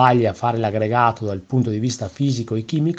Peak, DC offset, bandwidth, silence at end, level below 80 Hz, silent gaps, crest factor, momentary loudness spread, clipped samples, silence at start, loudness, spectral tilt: 0 dBFS; under 0.1%; 8.4 kHz; 0 s; -56 dBFS; none; 18 dB; 6 LU; under 0.1%; 0 s; -20 LUFS; -6.5 dB/octave